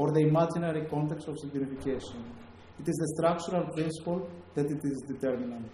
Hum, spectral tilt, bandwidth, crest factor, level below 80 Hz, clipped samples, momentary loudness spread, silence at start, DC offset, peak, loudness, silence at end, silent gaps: none; -7 dB/octave; 12.5 kHz; 16 dB; -60 dBFS; under 0.1%; 11 LU; 0 s; under 0.1%; -14 dBFS; -32 LUFS; 0 s; none